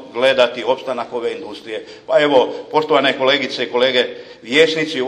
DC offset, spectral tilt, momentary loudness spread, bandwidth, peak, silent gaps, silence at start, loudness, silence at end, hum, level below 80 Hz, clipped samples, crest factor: under 0.1%; -3.5 dB/octave; 15 LU; 10.5 kHz; 0 dBFS; none; 0 s; -16 LUFS; 0 s; none; -64 dBFS; under 0.1%; 16 dB